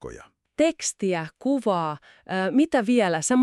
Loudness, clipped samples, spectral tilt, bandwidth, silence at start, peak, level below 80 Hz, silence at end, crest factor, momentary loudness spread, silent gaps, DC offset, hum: -24 LUFS; under 0.1%; -4.5 dB/octave; 12 kHz; 0 s; -8 dBFS; -60 dBFS; 0 s; 16 dB; 11 LU; none; under 0.1%; none